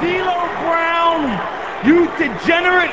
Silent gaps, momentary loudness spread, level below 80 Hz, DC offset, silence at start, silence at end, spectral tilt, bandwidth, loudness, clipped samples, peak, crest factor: none; 7 LU; -46 dBFS; 0.7%; 0 s; 0 s; -5.5 dB/octave; 8 kHz; -16 LUFS; under 0.1%; 0 dBFS; 16 dB